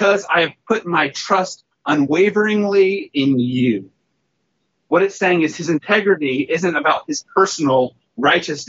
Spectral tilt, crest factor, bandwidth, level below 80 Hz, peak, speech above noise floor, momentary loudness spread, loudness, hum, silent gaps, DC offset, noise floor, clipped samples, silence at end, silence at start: -3.5 dB/octave; 16 dB; 8 kHz; -66 dBFS; -2 dBFS; 53 dB; 6 LU; -17 LUFS; none; none; under 0.1%; -70 dBFS; under 0.1%; 0.05 s; 0 s